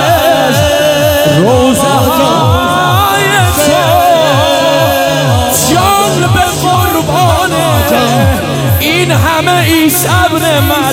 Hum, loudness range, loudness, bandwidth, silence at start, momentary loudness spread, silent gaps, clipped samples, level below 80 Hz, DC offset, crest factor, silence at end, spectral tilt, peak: none; 1 LU; -8 LUFS; 17 kHz; 0 s; 2 LU; none; 0.6%; -28 dBFS; 0.1%; 8 dB; 0 s; -4.5 dB/octave; 0 dBFS